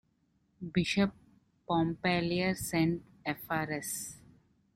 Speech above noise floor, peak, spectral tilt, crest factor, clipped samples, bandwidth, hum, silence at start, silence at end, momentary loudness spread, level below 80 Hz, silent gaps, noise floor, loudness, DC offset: 42 dB; -16 dBFS; -5 dB/octave; 18 dB; under 0.1%; 16 kHz; none; 0.6 s; 0.55 s; 9 LU; -60 dBFS; none; -73 dBFS; -32 LUFS; under 0.1%